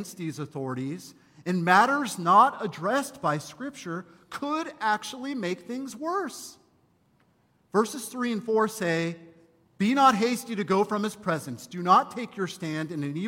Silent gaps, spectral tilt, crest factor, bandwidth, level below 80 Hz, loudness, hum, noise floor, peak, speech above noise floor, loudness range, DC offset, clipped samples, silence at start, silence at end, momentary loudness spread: none; -5 dB/octave; 20 dB; 16.5 kHz; -72 dBFS; -26 LUFS; none; -66 dBFS; -6 dBFS; 39 dB; 7 LU; under 0.1%; under 0.1%; 0 s; 0 s; 16 LU